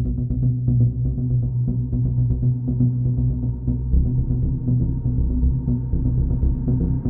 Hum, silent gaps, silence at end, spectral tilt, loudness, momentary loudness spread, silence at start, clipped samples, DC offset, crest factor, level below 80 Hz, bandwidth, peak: none; none; 0 s; -16.5 dB/octave; -22 LUFS; 3 LU; 0 s; under 0.1%; under 0.1%; 14 dB; -24 dBFS; 1.2 kHz; -6 dBFS